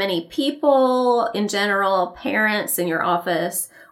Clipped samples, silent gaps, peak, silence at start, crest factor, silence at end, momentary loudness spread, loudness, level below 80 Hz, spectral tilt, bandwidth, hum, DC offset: under 0.1%; none; -4 dBFS; 0 s; 16 dB; 0.1 s; 6 LU; -20 LUFS; -64 dBFS; -3.5 dB/octave; 17.5 kHz; none; under 0.1%